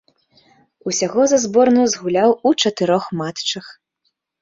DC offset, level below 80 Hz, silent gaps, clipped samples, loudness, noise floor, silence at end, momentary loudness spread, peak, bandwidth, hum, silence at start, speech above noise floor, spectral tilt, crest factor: under 0.1%; -62 dBFS; none; under 0.1%; -17 LUFS; -71 dBFS; 0.7 s; 9 LU; -2 dBFS; 7.8 kHz; none; 0.85 s; 54 dB; -4 dB/octave; 16 dB